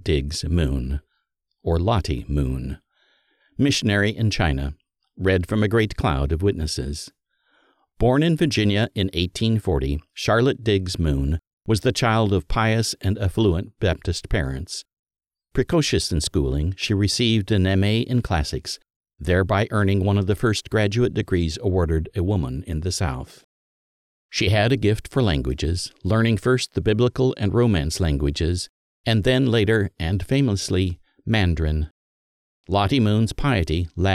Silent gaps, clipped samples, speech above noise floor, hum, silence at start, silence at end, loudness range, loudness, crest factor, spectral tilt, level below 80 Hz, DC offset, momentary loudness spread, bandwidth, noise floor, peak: 11.53-11.58 s, 14.99-15.04 s, 18.96-19.01 s, 23.44-24.29 s, 28.69-29.04 s, 31.91-32.64 s; under 0.1%; 54 dB; none; 0.05 s; 0 s; 3 LU; -22 LUFS; 16 dB; -6 dB/octave; -34 dBFS; under 0.1%; 9 LU; 14 kHz; -75 dBFS; -6 dBFS